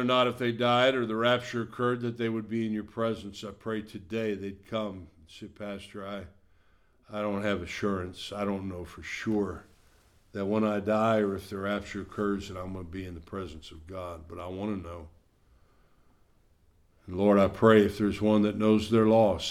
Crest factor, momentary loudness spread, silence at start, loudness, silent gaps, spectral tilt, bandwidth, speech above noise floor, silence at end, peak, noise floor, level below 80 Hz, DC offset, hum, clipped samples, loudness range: 22 dB; 17 LU; 0 s; -29 LUFS; none; -6.5 dB/octave; 13.5 kHz; 35 dB; 0 s; -8 dBFS; -64 dBFS; -56 dBFS; under 0.1%; none; under 0.1%; 13 LU